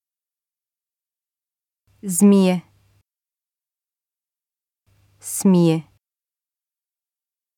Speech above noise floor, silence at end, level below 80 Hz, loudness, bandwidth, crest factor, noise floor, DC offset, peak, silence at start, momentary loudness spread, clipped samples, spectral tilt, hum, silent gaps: over 74 dB; 1.75 s; -72 dBFS; -18 LUFS; 17 kHz; 20 dB; under -90 dBFS; under 0.1%; -4 dBFS; 2.05 s; 16 LU; under 0.1%; -6 dB/octave; none; none